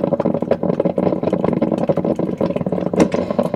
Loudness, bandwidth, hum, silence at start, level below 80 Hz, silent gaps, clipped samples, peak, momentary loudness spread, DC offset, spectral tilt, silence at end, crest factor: -19 LUFS; 11.5 kHz; none; 0 s; -50 dBFS; none; under 0.1%; 0 dBFS; 3 LU; under 0.1%; -8 dB/octave; 0 s; 18 dB